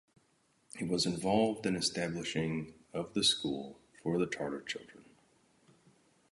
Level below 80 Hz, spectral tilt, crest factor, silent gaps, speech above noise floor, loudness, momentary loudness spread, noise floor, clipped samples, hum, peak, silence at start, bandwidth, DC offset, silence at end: -66 dBFS; -4 dB/octave; 20 dB; none; 38 dB; -34 LUFS; 13 LU; -72 dBFS; under 0.1%; none; -16 dBFS; 0.75 s; 11.5 kHz; under 0.1%; 1.3 s